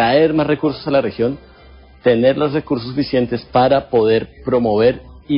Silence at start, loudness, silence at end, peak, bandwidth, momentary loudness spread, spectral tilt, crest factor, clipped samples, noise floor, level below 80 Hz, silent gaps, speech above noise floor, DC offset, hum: 0 s; -16 LUFS; 0 s; -2 dBFS; 5.4 kHz; 7 LU; -11.5 dB/octave; 14 dB; under 0.1%; -43 dBFS; -44 dBFS; none; 27 dB; under 0.1%; none